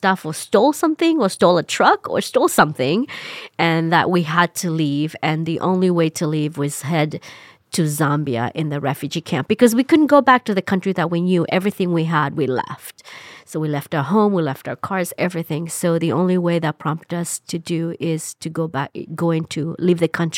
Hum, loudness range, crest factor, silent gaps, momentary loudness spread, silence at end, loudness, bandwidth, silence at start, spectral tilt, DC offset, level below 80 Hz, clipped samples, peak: none; 5 LU; 18 dB; none; 10 LU; 0 s; -19 LUFS; 16.5 kHz; 0 s; -5.5 dB/octave; under 0.1%; -66 dBFS; under 0.1%; -2 dBFS